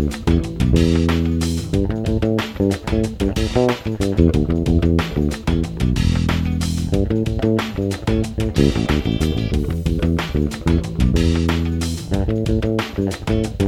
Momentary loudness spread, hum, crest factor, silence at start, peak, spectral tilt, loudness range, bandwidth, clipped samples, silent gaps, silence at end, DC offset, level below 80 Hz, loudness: 5 LU; none; 18 dB; 0 s; 0 dBFS; -6.5 dB/octave; 1 LU; 15 kHz; under 0.1%; none; 0 s; under 0.1%; -26 dBFS; -19 LUFS